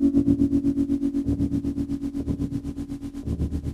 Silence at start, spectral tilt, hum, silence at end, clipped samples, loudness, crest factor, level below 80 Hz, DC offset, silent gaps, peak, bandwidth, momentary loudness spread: 0 s; -9.5 dB/octave; none; 0 s; under 0.1%; -26 LUFS; 18 dB; -36 dBFS; under 0.1%; none; -8 dBFS; 10 kHz; 11 LU